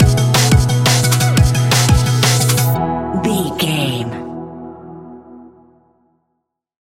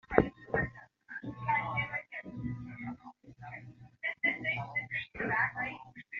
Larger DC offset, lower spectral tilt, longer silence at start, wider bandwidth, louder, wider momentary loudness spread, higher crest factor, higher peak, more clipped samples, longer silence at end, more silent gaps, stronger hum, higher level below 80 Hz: first, 0.3% vs under 0.1%; about the same, -4.5 dB/octave vs -4 dB/octave; about the same, 0 s vs 0.1 s; first, 17 kHz vs 7 kHz; first, -14 LUFS vs -35 LUFS; about the same, 19 LU vs 18 LU; second, 14 dB vs 32 dB; first, 0 dBFS vs -4 dBFS; neither; first, 1.4 s vs 0 s; neither; neither; first, -28 dBFS vs -56 dBFS